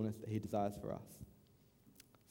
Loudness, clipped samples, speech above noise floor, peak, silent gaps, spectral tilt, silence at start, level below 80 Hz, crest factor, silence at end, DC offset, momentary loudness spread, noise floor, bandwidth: -42 LUFS; under 0.1%; 27 dB; -26 dBFS; none; -7.5 dB/octave; 0 s; -68 dBFS; 20 dB; 0.3 s; under 0.1%; 24 LU; -69 dBFS; 17.5 kHz